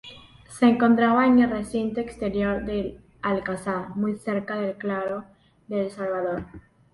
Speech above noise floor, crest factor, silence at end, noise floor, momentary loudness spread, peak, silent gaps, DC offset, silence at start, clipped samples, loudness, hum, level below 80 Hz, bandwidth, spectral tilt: 23 dB; 18 dB; 0.35 s; -46 dBFS; 13 LU; -8 dBFS; none; under 0.1%; 0.05 s; under 0.1%; -24 LUFS; none; -50 dBFS; 11.5 kHz; -6.5 dB/octave